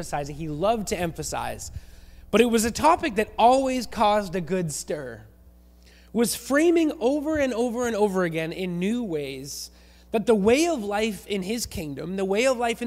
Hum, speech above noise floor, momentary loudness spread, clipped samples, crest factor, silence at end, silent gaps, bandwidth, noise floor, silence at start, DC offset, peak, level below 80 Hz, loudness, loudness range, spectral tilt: none; 28 dB; 13 LU; under 0.1%; 20 dB; 0 s; none; 16 kHz; -52 dBFS; 0 s; under 0.1%; -6 dBFS; -48 dBFS; -24 LUFS; 3 LU; -4.5 dB/octave